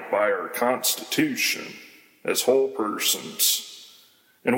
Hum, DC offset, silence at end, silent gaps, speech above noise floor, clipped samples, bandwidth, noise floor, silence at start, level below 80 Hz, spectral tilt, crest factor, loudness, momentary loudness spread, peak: none; under 0.1%; 0 s; none; 33 dB; under 0.1%; 17 kHz; -57 dBFS; 0 s; -76 dBFS; -1.5 dB/octave; 18 dB; -23 LUFS; 15 LU; -8 dBFS